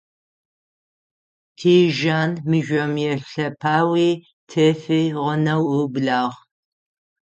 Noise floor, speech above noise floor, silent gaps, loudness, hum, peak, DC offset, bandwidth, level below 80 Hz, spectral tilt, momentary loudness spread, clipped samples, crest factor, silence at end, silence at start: under -90 dBFS; over 71 dB; 4.33-4.47 s; -20 LUFS; none; -4 dBFS; under 0.1%; 8.4 kHz; -64 dBFS; -6.5 dB/octave; 8 LU; under 0.1%; 16 dB; 0.9 s; 1.6 s